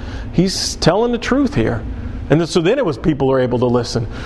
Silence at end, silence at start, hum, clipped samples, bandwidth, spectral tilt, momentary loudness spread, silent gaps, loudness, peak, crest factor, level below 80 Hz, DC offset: 0 s; 0 s; none; under 0.1%; 12.5 kHz; -5.5 dB/octave; 7 LU; none; -16 LUFS; 0 dBFS; 16 dB; -30 dBFS; under 0.1%